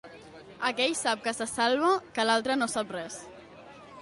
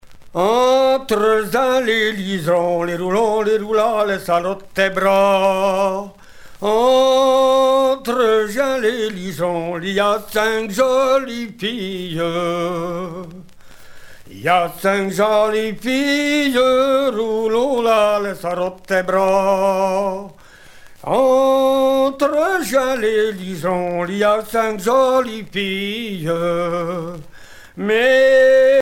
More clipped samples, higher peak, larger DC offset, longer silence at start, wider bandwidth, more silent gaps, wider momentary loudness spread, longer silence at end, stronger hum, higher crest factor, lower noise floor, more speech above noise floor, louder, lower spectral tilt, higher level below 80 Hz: neither; second, -12 dBFS vs -2 dBFS; neither; about the same, 0.05 s vs 0.05 s; second, 11.5 kHz vs 16.5 kHz; neither; first, 23 LU vs 10 LU; about the same, 0 s vs 0 s; neither; about the same, 18 dB vs 14 dB; first, -49 dBFS vs -41 dBFS; second, 21 dB vs 25 dB; second, -28 LUFS vs -17 LUFS; second, -2 dB/octave vs -4.5 dB/octave; second, -66 dBFS vs -50 dBFS